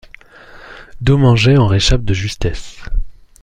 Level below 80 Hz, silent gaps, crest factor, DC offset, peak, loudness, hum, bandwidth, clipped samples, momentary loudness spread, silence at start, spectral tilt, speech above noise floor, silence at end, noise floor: -24 dBFS; none; 14 dB; under 0.1%; -2 dBFS; -14 LUFS; none; 10 kHz; under 0.1%; 17 LU; 0.55 s; -6 dB/octave; 27 dB; 0.3 s; -40 dBFS